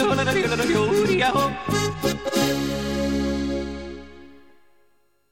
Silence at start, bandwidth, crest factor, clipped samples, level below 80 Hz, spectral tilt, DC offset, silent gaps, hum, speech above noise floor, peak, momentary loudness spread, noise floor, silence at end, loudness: 0 s; 17 kHz; 16 dB; under 0.1%; -42 dBFS; -4.5 dB/octave; 0.4%; none; none; 43 dB; -8 dBFS; 10 LU; -65 dBFS; 1 s; -22 LUFS